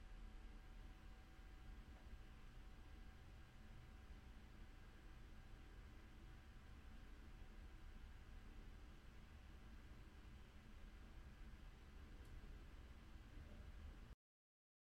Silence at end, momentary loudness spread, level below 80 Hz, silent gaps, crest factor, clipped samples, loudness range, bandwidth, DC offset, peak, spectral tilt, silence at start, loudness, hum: 0.75 s; 3 LU; -60 dBFS; none; 12 dB; under 0.1%; 1 LU; 15.5 kHz; under 0.1%; -46 dBFS; -5.5 dB/octave; 0 s; -64 LUFS; none